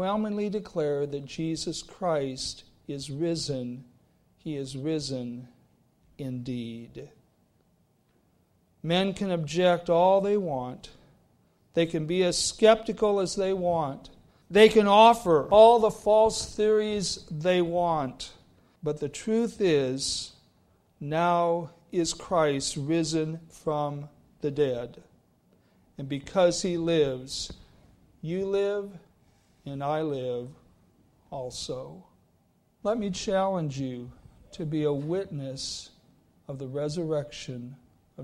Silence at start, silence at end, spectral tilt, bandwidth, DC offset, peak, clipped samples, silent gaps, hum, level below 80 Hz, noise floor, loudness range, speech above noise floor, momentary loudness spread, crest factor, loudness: 0 s; 0 s; -5 dB/octave; 13 kHz; under 0.1%; -6 dBFS; under 0.1%; none; none; -56 dBFS; -67 dBFS; 14 LU; 41 dB; 18 LU; 22 dB; -26 LUFS